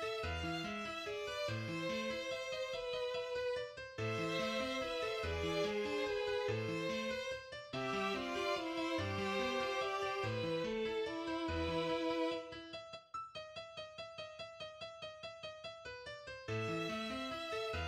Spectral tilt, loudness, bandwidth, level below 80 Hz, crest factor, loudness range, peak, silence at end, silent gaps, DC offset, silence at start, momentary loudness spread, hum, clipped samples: -5 dB/octave; -40 LUFS; 15.5 kHz; -60 dBFS; 16 dB; 8 LU; -26 dBFS; 0 s; none; under 0.1%; 0 s; 11 LU; none; under 0.1%